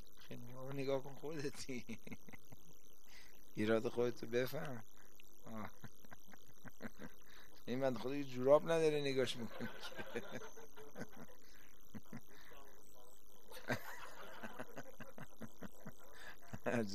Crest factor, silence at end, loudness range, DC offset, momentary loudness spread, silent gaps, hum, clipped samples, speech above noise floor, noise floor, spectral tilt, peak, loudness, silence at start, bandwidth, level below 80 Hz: 26 dB; 0 s; 14 LU; 0.7%; 24 LU; none; none; under 0.1%; 25 dB; -66 dBFS; -5.5 dB/octave; -18 dBFS; -42 LUFS; 0 s; 14 kHz; -72 dBFS